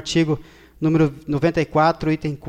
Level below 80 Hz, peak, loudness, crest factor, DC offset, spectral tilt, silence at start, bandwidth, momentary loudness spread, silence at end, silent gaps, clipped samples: -44 dBFS; -6 dBFS; -20 LUFS; 14 dB; under 0.1%; -6.5 dB/octave; 0 s; 9.6 kHz; 5 LU; 0 s; none; under 0.1%